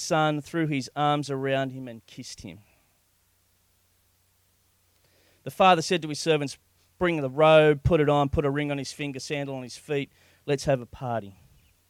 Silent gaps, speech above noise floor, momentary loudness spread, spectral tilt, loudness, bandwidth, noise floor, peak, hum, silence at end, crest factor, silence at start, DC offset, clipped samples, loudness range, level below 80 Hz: none; 42 dB; 21 LU; -5.5 dB/octave; -25 LUFS; 16 kHz; -67 dBFS; -6 dBFS; none; 0.6 s; 20 dB; 0 s; under 0.1%; under 0.1%; 9 LU; -50 dBFS